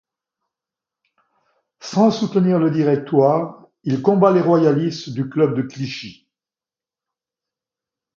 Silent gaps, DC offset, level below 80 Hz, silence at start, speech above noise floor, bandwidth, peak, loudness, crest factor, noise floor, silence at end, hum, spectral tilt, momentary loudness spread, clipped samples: none; under 0.1%; -66 dBFS; 1.85 s; over 73 dB; 7.4 kHz; 0 dBFS; -18 LUFS; 20 dB; under -90 dBFS; 2.05 s; none; -7.5 dB/octave; 14 LU; under 0.1%